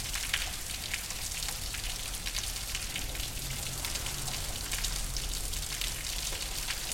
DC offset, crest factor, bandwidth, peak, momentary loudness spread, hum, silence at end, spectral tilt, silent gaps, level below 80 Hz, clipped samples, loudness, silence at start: under 0.1%; 24 dB; 17 kHz; -10 dBFS; 3 LU; none; 0 s; -1 dB/octave; none; -42 dBFS; under 0.1%; -34 LUFS; 0 s